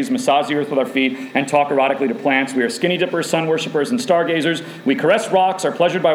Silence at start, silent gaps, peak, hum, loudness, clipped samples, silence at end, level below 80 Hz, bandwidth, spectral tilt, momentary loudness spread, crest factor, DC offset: 0 s; none; -2 dBFS; none; -18 LUFS; under 0.1%; 0 s; -74 dBFS; 15.5 kHz; -4.5 dB/octave; 4 LU; 16 dB; under 0.1%